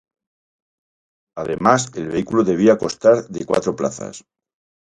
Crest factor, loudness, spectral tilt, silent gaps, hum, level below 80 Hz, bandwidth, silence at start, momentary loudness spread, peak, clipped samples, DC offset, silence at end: 20 dB; -18 LUFS; -5.5 dB/octave; none; none; -54 dBFS; 11 kHz; 1.35 s; 15 LU; 0 dBFS; under 0.1%; under 0.1%; 0.65 s